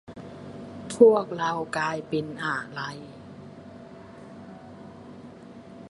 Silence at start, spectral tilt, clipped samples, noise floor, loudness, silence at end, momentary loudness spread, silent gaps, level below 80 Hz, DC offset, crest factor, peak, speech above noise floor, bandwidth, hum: 0.1 s; -5.5 dB/octave; under 0.1%; -45 dBFS; -25 LUFS; 0 s; 27 LU; none; -64 dBFS; under 0.1%; 24 dB; -4 dBFS; 21 dB; 11.5 kHz; none